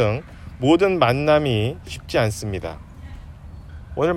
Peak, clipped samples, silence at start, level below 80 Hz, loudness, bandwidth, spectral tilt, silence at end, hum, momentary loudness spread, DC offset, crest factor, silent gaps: -4 dBFS; under 0.1%; 0 s; -42 dBFS; -20 LUFS; 16 kHz; -6 dB/octave; 0 s; none; 23 LU; under 0.1%; 18 dB; none